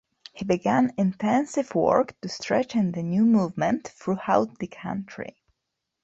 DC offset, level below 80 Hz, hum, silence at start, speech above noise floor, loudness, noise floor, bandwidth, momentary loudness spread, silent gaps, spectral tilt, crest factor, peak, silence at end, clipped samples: under 0.1%; -62 dBFS; none; 0.35 s; 58 dB; -25 LUFS; -82 dBFS; 8 kHz; 12 LU; none; -6.5 dB/octave; 20 dB; -4 dBFS; 0.75 s; under 0.1%